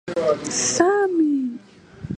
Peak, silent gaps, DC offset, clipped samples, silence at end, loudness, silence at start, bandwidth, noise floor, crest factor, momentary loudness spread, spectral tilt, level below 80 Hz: -4 dBFS; none; under 0.1%; under 0.1%; 0 s; -20 LUFS; 0.05 s; 11 kHz; -42 dBFS; 18 dB; 16 LU; -3.5 dB/octave; -54 dBFS